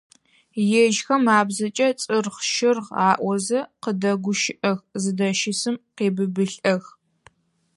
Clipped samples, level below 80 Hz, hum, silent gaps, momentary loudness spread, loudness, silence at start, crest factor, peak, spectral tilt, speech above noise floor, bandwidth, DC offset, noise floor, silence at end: under 0.1%; -72 dBFS; none; none; 7 LU; -22 LUFS; 0.55 s; 20 dB; -4 dBFS; -4 dB/octave; 35 dB; 11.5 kHz; under 0.1%; -57 dBFS; 0.95 s